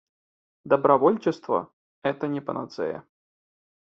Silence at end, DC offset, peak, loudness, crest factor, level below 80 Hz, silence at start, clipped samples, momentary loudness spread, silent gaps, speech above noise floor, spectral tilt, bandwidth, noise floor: 0.85 s; under 0.1%; -4 dBFS; -25 LUFS; 22 dB; -72 dBFS; 0.65 s; under 0.1%; 13 LU; 1.73-2.02 s; over 66 dB; -6 dB/octave; 7.4 kHz; under -90 dBFS